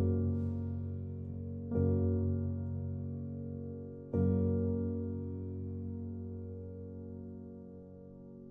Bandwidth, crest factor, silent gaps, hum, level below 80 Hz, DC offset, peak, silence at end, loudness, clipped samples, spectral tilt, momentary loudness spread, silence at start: 1.5 kHz; 16 dB; none; none; -62 dBFS; under 0.1%; -20 dBFS; 0 s; -37 LUFS; under 0.1%; -13.5 dB/octave; 16 LU; 0 s